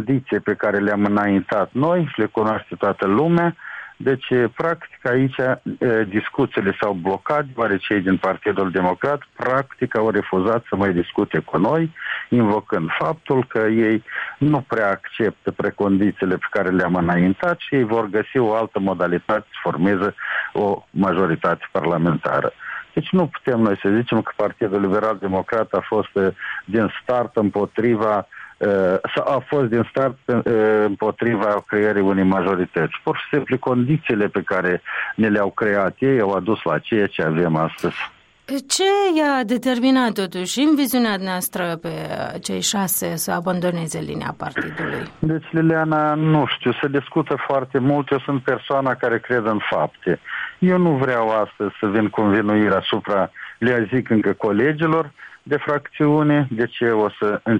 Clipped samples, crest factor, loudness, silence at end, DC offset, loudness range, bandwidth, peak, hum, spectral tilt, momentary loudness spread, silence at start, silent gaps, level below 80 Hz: under 0.1%; 14 dB; -20 LUFS; 0 s; under 0.1%; 2 LU; 14.5 kHz; -6 dBFS; none; -6 dB/octave; 6 LU; 0 s; none; -56 dBFS